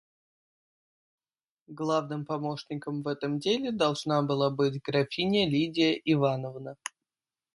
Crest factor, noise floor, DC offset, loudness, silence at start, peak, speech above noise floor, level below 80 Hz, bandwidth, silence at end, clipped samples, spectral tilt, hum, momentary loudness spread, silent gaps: 18 dB; under -90 dBFS; under 0.1%; -29 LUFS; 1.7 s; -12 dBFS; over 62 dB; -68 dBFS; 11.5 kHz; 0.65 s; under 0.1%; -6 dB/octave; none; 10 LU; none